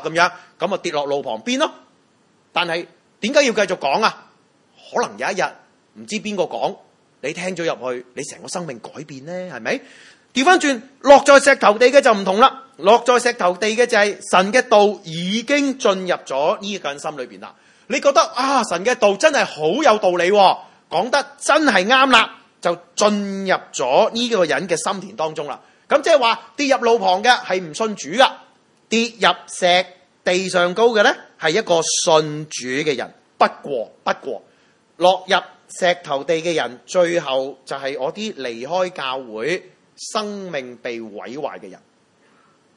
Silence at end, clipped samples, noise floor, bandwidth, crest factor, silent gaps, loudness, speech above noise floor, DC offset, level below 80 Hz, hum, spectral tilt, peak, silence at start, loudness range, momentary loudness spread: 1 s; under 0.1%; -58 dBFS; 11.5 kHz; 18 dB; none; -18 LUFS; 40 dB; under 0.1%; -66 dBFS; none; -3 dB/octave; 0 dBFS; 0 s; 11 LU; 14 LU